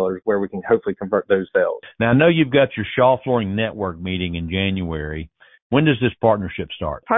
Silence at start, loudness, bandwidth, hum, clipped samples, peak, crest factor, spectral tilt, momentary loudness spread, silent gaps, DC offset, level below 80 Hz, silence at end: 0 s; -20 LUFS; 4 kHz; none; under 0.1%; -2 dBFS; 18 dB; -11.5 dB/octave; 11 LU; 5.62-5.70 s; under 0.1%; -40 dBFS; 0 s